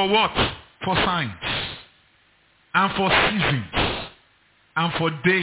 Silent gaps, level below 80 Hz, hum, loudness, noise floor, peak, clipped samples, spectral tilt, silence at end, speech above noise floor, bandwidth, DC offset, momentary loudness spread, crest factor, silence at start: none; -42 dBFS; none; -22 LUFS; -60 dBFS; -8 dBFS; under 0.1%; -9 dB/octave; 0 s; 39 dB; 4 kHz; under 0.1%; 13 LU; 16 dB; 0 s